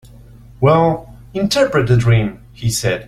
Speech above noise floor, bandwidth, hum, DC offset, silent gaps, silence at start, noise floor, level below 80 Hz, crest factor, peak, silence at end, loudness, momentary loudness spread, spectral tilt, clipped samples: 26 dB; 14.5 kHz; none; under 0.1%; none; 0.6 s; -40 dBFS; -38 dBFS; 14 dB; -2 dBFS; 0.05 s; -16 LUFS; 12 LU; -5.5 dB/octave; under 0.1%